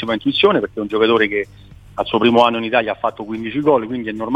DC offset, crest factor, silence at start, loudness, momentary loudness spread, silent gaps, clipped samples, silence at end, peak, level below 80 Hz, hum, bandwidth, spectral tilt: under 0.1%; 18 dB; 0 s; -17 LUFS; 11 LU; none; under 0.1%; 0 s; 0 dBFS; -50 dBFS; none; 8.8 kHz; -6.5 dB/octave